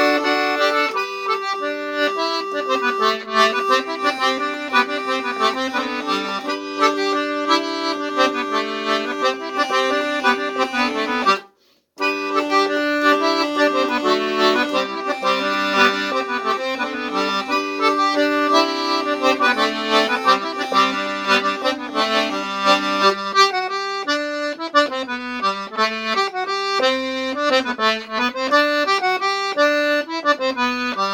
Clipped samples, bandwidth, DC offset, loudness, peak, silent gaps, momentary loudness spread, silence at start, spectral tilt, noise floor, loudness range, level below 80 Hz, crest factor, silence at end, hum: under 0.1%; 18 kHz; under 0.1%; -19 LUFS; 0 dBFS; none; 6 LU; 0 s; -2.5 dB/octave; -58 dBFS; 3 LU; -62 dBFS; 20 dB; 0 s; none